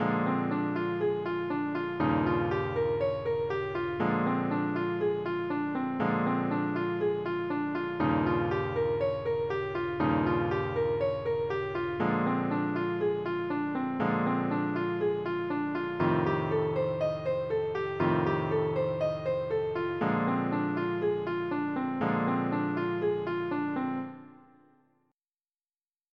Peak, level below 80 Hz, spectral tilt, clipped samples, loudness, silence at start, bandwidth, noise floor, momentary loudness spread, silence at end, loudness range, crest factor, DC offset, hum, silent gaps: -14 dBFS; -60 dBFS; -9 dB/octave; under 0.1%; -30 LUFS; 0 s; 6 kHz; under -90 dBFS; 4 LU; 1.8 s; 1 LU; 16 dB; under 0.1%; none; none